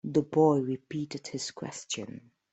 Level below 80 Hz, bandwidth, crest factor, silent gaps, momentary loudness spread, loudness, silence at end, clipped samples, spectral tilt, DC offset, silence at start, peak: -72 dBFS; 8.4 kHz; 18 dB; none; 16 LU; -30 LUFS; 0.35 s; under 0.1%; -5.5 dB/octave; under 0.1%; 0.05 s; -12 dBFS